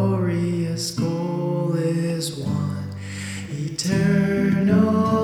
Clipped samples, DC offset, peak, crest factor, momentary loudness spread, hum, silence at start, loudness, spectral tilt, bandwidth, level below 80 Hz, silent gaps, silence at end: under 0.1%; under 0.1%; -6 dBFS; 14 dB; 12 LU; none; 0 s; -22 LUFS; -6.5 dB/octave; 15 kHz; -52 dBFS; none; 0 s